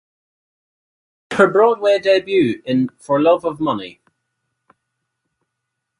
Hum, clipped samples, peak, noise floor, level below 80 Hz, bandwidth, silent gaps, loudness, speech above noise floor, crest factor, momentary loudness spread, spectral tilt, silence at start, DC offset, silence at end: none; under 0.1%; 0 dBFS; -78 dBFS; -62 dBFS; 11 kHz; none; -16 LUFS; 62 dB; 18 dB; 10 LU; -6 dB/octave; 1.3 s; under 0.1%; 2.1 s